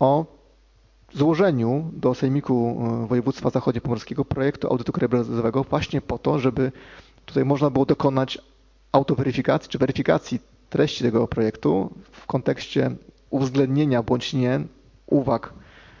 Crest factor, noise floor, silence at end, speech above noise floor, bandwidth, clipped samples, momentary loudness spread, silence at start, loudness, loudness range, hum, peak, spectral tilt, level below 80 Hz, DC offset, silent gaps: 20 dB; -56 dBFS; 0.45 s; 34 dB; 7.4 kHz; under 0.1%; 7 LU; 0 s; -23 LUFS; 1 LU; none; -2 dBFS; -7.5 dB/octave; -48 dBFS; under 0.1%; none